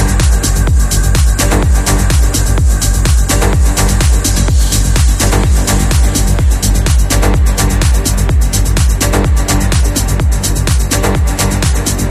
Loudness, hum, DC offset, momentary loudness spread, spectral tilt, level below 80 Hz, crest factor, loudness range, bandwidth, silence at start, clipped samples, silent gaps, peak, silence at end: -12 LUFS; none; under 0.1%; 2 LU; -4.5 dB/octave; -12 dBFS; 10 dB; 1 LU; 15.5 kHz; 0 s; under 0.1%; none; 0 dBFS; 0 s